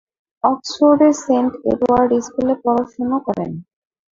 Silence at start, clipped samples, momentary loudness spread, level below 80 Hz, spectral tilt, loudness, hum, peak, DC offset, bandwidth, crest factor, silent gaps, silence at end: 0.45 s; under 0.1%; 9 LU; -52 dBFS; -6 dB/octave; -17 LUFS; none; -2 dBFS; under 0.1%; 7.8 kHz; 16 dB; none; 0.5 s